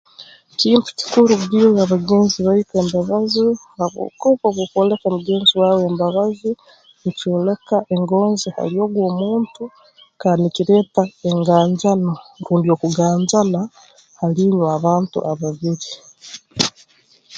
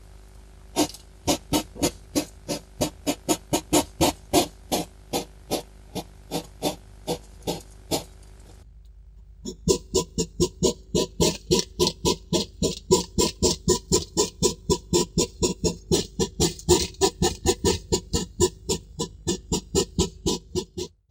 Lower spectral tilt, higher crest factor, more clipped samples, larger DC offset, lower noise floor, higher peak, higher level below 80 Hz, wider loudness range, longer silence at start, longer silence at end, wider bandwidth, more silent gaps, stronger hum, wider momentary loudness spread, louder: first, -6 dB/octave vs -4 dB/octave; about the same, 18 dB vs 22 dB; neither; neither; first, -53 dBFS vs -47 dBFS; first, 0 dBFS vs -4 dBFS; second, -58 dBFS vs -40 dBFS; second, 4 LU vs 8 LU; about the same, 0.2 s vs 0.15 s; second, 0 s vs 0.25 s; second, 9 kHz vs 16 kHz; neither; neither; about the same, 11 LU vs 11 LU; first, -17 LUFS vs -25 LUFS